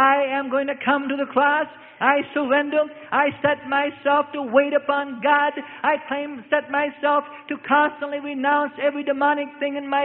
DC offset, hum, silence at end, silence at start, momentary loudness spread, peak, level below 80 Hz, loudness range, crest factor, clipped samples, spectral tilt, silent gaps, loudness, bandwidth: under 0.1%; none; 0 s; 0 s; 6 LU; -4 dBFS; -70 dBFS; 2 LU; 18 dB; under 0.1%; -9 dB/octave; none; -22 LUFS; 4.1 kHz